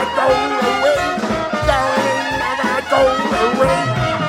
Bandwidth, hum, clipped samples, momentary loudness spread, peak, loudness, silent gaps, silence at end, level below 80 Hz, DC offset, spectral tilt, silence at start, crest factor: 16 kHz; none; under 0.1%; 4 LU; -2 dBFS; -16 LUFS; none; 0 s; -36 dBFS; under 0.1%; -4.5 dB/octave; 0 s; 14 dB